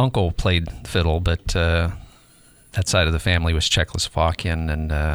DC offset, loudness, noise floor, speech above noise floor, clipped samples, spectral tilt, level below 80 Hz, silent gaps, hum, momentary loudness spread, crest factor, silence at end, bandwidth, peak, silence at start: under 0.1%; -21 LUFS; -52 dBFS; 31 dB; under 0.1%; -4.5 dB/octave; -28 dBFS; none; none; 6 LU; 18 dB; 0 s; over 20 kHz; -4 dBFS; 0 s